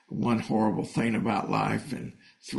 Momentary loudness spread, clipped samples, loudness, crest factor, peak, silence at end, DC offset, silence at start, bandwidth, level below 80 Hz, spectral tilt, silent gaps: 12 LU; under 0.1%; -28 LUFS; 16 dB; -12 dBFS; 0 s; under 0.1%; 0.1 s; 11.5 kHz; -60 dBFS; -6.5 dB/octave; none